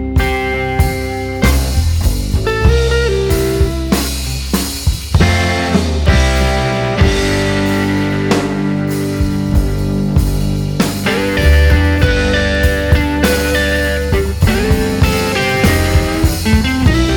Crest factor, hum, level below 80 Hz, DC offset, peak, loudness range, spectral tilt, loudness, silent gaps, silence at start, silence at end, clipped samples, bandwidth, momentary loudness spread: 12 dB; none; -18 dBFS; under 0.1%; 0 dBFS; 2 LU; -5.5 dB/octave; -14 LUFS; none; 0 s; 0 s; under 0.1%; 19.5 kHz; 5 LU